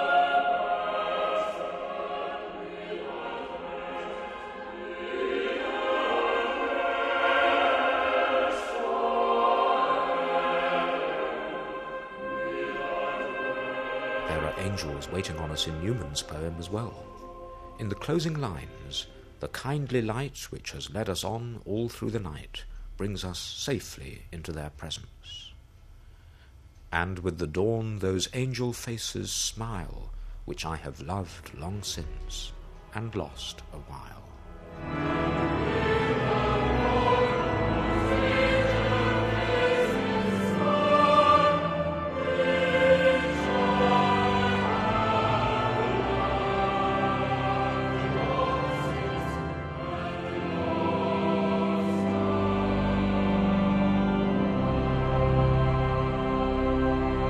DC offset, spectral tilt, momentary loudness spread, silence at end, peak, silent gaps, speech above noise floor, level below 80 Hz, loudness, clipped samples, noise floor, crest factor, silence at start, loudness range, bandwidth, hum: under 0.1%; -5.5 dB/octave; 14 LU; 0 s; -8 dBFS; none; 19 dB; -42 dBFS; -27 LUFS; under 0.1%; -52 dBFS; 20 dB; 0 s; 12 LU; 14 kHz; none